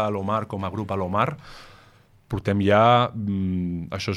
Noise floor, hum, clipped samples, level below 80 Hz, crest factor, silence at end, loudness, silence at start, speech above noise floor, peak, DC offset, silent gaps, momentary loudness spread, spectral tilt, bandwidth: -54 dBFS; none; under 0.1%; -52 dBFS; 20 dB; 0 s; -23 LUFS; 0 s; 32 dB; -4 dBFS; under 0.1%; none; 12 LU; -7 dB/octave; 12.5 kHz